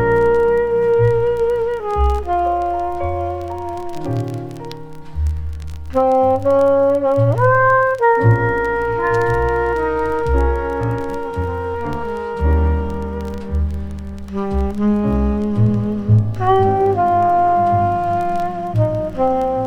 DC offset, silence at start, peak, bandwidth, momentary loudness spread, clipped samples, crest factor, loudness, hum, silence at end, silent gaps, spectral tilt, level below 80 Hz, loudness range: under 0.1%; 0 s; -2 dBFS; 10 kHz; 11 LU; under 0.1%; 14 dB; -17 LUFS; none; 0 s; none; -9 dB/octave; -26 dBFS; 7 LU